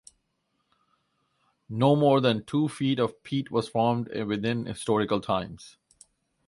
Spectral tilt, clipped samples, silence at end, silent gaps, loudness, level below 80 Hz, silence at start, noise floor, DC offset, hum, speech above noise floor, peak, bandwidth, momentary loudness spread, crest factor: -6.5 dB/octave; under 0.1%; 0.8 s; none; -26 LUFS; -62 dBFS; 1.7 s; -76 dBFS; under 0.1%; none; 50 dB; -8 dBFS; 11.5 kHz; 9 LU; 20 dB